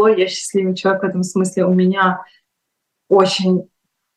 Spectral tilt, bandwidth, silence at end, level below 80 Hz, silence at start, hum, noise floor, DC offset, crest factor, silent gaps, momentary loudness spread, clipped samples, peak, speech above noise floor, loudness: -5.5 dB/octave; 12 kHz; 0.55 s; -66 dBFS; 0 s; none; -76 dBFS; under 0.1%; 16 dB; none; 5 LU; under 0.1%; 0 dBFS; 60 dB; -16 LUFS